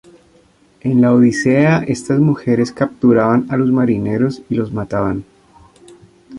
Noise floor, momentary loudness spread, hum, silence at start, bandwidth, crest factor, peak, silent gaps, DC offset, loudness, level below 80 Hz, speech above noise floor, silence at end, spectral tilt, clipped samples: -51 dBFS; 9 LU; none; 0.85 s; 10.5 kHz; 14 dB; -2 dBFS; none; under 0.1%; -15 LUFS; -48 dBFS; 37 dB; 0 s; -7.5 dB/octave; under 0.1%